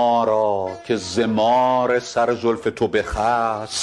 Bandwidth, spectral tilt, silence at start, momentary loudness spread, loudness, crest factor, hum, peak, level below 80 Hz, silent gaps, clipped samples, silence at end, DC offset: 12 kHz; -4.5 dB/octave; 0 s; 6 LU; -20 LUFS; 12 dB; none; -6 dBFS; -42 dBFS; none; under 0.1%; 0 s; under 0.1%